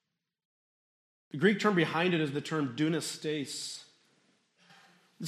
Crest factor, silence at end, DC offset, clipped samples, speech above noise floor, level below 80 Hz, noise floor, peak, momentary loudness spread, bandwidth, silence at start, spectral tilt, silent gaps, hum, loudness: 22 dB; 0 s; under 0.1%; under 0.1%; 40 dB; -80 dBFS; -71 dBFS; -10 dBFS; 12 LU; 14 kHz; 1.35 s; -5 dB/octave; none; none; -31 LUFS